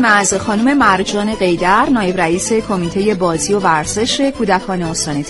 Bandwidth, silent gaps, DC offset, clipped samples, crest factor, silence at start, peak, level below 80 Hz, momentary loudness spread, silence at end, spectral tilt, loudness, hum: 11.5 kHz; none; under 0.1%; under 0.1%; 14 dB; 0 s; 0 dBFS; -38 dBFS; 5 LU; 0 s; -4 dB/octave; -14 LUFS; none